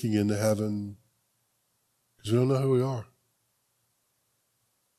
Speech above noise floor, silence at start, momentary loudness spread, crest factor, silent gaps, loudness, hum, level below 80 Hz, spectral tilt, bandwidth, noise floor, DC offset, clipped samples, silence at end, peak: 48 dB; 0 s; 14 LU; 18 dB; none; -28 LUFS; none; -70 dBFS; -7 dB/octave; 13.5 kHz; -74 dBFS; under 0.1%; under 0.1%; 1.95 s; -12 dBFS